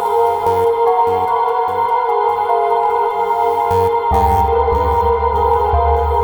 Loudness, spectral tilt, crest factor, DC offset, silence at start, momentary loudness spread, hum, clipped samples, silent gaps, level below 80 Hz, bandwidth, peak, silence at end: -15 LUFS; -7 dB/octave; 12 dB; under 0.1%; 0 s; 2 LU; none; under 0.1%; none; -26 dBFS; over 20 kHz; -2 dBFS; 0 s